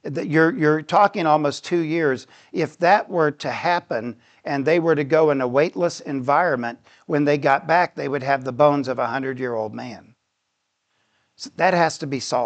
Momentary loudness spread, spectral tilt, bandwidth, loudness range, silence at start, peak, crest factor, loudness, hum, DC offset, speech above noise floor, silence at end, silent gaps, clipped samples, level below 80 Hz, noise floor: 10 LU; -6 dB/octave; 9 kHz; 5 LU; 0.05 s; -4 dBFS; 18 dB; -20 LUFS; none; under 0.1%; 54 dB; 0 s; none; under 0.1%; -72 dBFS; -75 dBFS